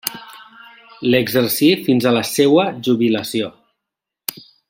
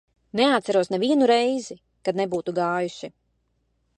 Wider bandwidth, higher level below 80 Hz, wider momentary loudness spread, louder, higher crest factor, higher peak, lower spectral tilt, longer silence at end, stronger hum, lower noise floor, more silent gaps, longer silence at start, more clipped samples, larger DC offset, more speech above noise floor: first, 16.5 kHz vs 11 kHz; first, -60 dBFS vs -68 dBFS; about the same, 14 LU vs 13 LU; first, -16 LUFS vs -23 LUFS; about the same, 18 dB vs 18 dB; first, 0 dBFS vs -6 dBFS; about the same, -4.5 dB/octave vs -5 dB/octave; first, 1.2 s vs 0.9 s; neither; first, -82 dBFS vs -70 dBFS; neither; second, 0.05 s vs 0.35 s; neither; neither; first, 67 dB vs 48 dB